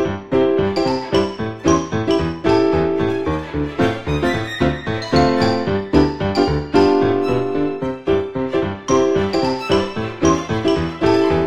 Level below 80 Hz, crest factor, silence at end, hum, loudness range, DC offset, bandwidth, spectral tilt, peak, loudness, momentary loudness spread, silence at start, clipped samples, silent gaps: -36 dBFS; 16 dB; 0 s; none; 2 LU; 0.8%; 10 kHz; -6 dB/octave; 0 dBFS; -18 LUFS; 5 LU; 0 s; under 0.1%; none